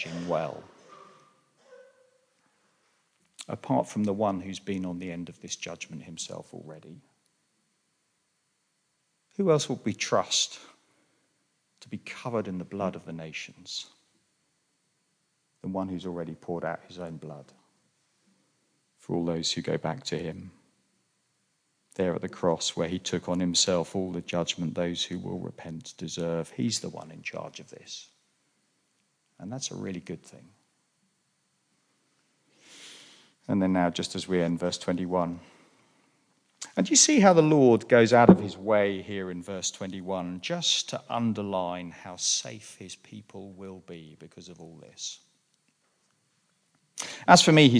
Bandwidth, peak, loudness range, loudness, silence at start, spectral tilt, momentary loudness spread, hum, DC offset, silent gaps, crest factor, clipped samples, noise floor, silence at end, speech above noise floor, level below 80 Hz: 10.5 kHz; -2 dBFS; 19 LU; -27 LUFS; 0 s; -4 dB/octave; 25 LU; none; under 0.1%; none; 28 dB; under 0.1%; -75 dBFS; 0 s; 48 dB; -66 dBFS